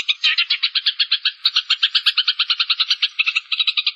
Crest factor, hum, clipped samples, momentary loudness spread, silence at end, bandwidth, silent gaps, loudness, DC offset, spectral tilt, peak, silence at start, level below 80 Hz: 16 dB; none; under 0.1%; 3 LU; 0 s; 13 kHz; none; -16 LUFS; under 0.1%; 7.5 dB/octave; -4 dBFS; 0 s; -84 dBFS